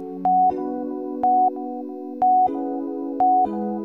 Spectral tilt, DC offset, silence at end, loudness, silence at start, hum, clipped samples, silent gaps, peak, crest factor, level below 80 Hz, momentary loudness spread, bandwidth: -10.5 dB/octave; 0.1%; 0 s; -21 LUFS; 0 s; none; under 0.1%; none; -10 dBFS; 12 dB; -62 dBFS; 11 LU; 2.7 kHz